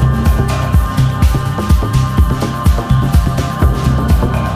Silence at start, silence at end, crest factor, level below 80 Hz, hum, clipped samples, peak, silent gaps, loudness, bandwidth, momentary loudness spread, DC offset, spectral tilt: 0 s; 0 s; 12 dB; -16 dBFS; none; under 0.1%; 0 dBFS; none; -14 LUFS; 15.5 kHz; 2 LU; under 0.1%; -7 dB/octave